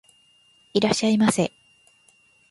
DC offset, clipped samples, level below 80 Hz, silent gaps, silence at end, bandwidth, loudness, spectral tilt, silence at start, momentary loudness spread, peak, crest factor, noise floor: under 0.1%; under 0.1%; -62 dBFS; none; 1.05 s; 11.5 kHz; -22 LUFS; -4.5 dB/octave; 0.75 s; 8 LU; -4 dBFS; 22 dB; -59 dBFS